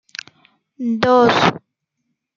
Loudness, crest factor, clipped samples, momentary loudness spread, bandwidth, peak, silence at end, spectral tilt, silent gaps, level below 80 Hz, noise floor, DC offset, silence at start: -15 LUFS; 18 dB; under 0.1%; 21 LU; 7.4 kHz; 0 dBFS; 0.8 s; -5 dB/octave; none; -56 dBFS; -74 dBFS; under 0.1%; 0.8 s